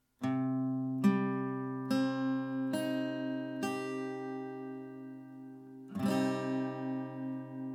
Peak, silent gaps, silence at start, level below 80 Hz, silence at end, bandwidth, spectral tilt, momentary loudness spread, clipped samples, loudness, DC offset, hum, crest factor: -16 dBFS; none; 0.2 s; -82 dBFS; 0 s; 16 kHz; -7 dB/octave; 15 LU; under 0.1%; -35 LUFS; under 0.1%; none; 20 dB